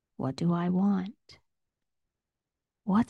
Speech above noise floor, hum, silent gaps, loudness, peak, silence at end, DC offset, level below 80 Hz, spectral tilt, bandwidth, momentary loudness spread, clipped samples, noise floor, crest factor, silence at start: 60 dB; none; none; -29 LUFS; -14 dBFS; 0.05 s; under 0.1%; -66 dBFS; -8.5 dB/octave; 9.4 kHz; 13 LU; under 0.1%; -89 dBFS; 16 dB; 0.2 s